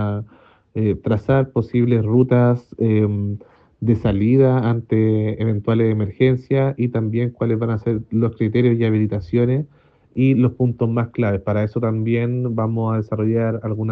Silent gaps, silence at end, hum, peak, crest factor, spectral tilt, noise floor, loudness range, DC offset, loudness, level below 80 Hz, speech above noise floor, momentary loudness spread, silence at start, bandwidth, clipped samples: none; 0 s; none; -2 dBFS; 16 dB; -11 dB/octave; -49 dBFS; 2 LU; under 0.1%; -19 LUFS; -48 dBFS; 31 dB; 6 LU; 0 s; 4.6 kHz; under 0.1%